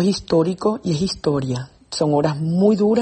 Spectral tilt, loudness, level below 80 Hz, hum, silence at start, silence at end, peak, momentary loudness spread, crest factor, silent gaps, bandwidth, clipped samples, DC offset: -6.5 dB/octave; -20 LUFS; -48 dBFS; none; 0 s; 0 s; -4 dBFS; 8 LU; 14 dB; none; 8.8 kHz; under 0.1%; under 0.1%